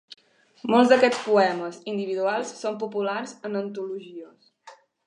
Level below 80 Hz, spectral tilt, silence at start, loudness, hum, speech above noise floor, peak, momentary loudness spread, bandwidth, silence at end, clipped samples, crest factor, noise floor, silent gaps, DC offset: -80 dBFS; -4.5 dB/octave; 0.65 s; -24 LUFS; none; 28 dB; -4 dBFS; 17 LU; 10.5 kHz; 0.35 s; under 0.1%; 20 dB; -52 dBFS; none; under 0.1%